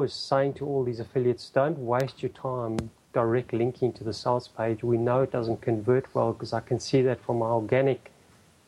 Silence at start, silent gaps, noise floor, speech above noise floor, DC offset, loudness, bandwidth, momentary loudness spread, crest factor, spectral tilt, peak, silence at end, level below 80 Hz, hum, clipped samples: 0 s; none; -58 dBFS; 31 dB; under 0.1%; -27 LUFS; 11.5 kHz; 7 LU; 18 dB; -7 dB/octave; -10 dBFS; 0.7 s; -60 dBFS; none; under 0.1%